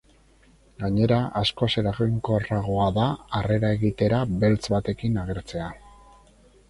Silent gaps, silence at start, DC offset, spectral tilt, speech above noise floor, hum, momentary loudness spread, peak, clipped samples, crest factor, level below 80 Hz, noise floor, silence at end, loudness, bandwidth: none; 0.8 s; under 0.1%; -7 dB/octave; 33 dB; none; 9 LU; -8 dBFS; under 0.1%; 16 dB; -44 dBFS; -57 dBFS; 0.8 s; -24 LUFS; 11.5 kHz